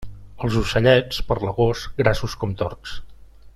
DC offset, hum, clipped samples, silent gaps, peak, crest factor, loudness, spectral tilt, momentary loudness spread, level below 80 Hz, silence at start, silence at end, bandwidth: under 0.1%; none; under 0.1%; none; -2 dBFS; 20 dB; -21 LUFS; -6 dB/octave; 14 LU; -34 dBFS; 0 s; 0.05 s; 13.5 kHz